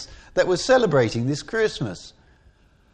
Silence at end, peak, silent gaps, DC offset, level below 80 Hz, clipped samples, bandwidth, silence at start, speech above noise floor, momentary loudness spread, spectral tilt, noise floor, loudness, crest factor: 0.85 s; -6 dBFS; none; under 0.1%; -50 dBFS; under 0.1%; 9.6 kHz; 0 s; 35 dB; 13 LU; -5 dB/octave; -56 dBFS; -22 LUFS; 18 dB